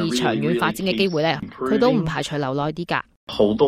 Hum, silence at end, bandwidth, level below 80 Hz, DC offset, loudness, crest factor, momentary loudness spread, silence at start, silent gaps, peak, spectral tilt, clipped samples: none; 0 s; 15 kHz; -50 dBFS; under 0.1%; -22 LUFS; 16 dB; 7 LU; 0 s; 3.16-3.27 s; -4 dBFS; -5.5 dB/octave; under 0.1%